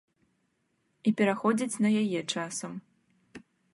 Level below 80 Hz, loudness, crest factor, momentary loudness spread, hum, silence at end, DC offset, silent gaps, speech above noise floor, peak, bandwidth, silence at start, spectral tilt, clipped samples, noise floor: -78 dBFS; -29 LUFS; 18 dB; 11 LU; none; 0.35 s; under 0.1%; none; 47 dB; -12 dBFS; 11.5 kHz; 1.05 s; -5 dB/octave; under 0.1%; -75 dBFS